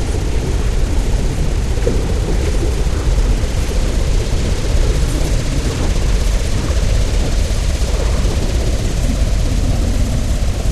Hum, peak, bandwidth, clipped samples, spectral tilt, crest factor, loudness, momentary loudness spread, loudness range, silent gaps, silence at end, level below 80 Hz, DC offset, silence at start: none; -2 dBFS; 13 kHz; under 0.1%; -5.5 dB/octave; 12 dB; -18 LUFS; 2 LU; 0 LU; none; 0 s; -16 dBFS; 0.8%; 0 s